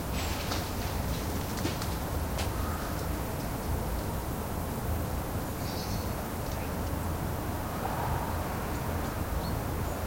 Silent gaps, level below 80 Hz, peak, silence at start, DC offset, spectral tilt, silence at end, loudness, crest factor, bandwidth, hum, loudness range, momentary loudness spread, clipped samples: none; -40 dBFS; -18 dBFS; 0 s; under 0.1%; -5 dB/octave; 0 s; -33 LUFS; 16 dB; 16.5 kHz; none; 1 LU; 2 LU; under 0.1%